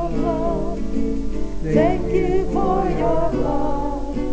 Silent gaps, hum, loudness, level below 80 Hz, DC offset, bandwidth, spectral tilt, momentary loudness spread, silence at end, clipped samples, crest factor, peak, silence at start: none; none; -22 LUFS; -28 dBFS; under 0.1%; 8 kHz; -8 dB/octave; 7 LU; 0 s; under 0.1%; 14 dB; -4 dBFS; 0 s